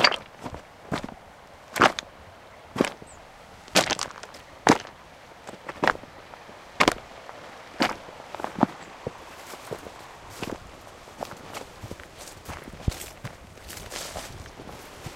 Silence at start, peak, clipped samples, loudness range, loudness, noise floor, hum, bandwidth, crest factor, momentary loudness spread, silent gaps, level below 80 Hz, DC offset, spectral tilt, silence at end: 0 s; 0 dBFS; under 0.1%; 11 LU; -28 LUFS; -48 dBFS; none; 16.5 kHz; 30 dB; 23 LU; none; -50 dBFS; under 0.1%; -3 dB/octave; 0 s